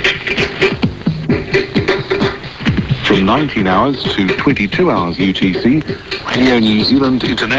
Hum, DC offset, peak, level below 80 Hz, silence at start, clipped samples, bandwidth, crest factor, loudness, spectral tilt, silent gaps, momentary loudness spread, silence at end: none; 0.1%; 0 dBFS; -34 dBFS; 0 s; under 0.1%; 8 kHz; 14 dB; -14 LUFS; -6 dB/octave; none; 6 LU; 0 s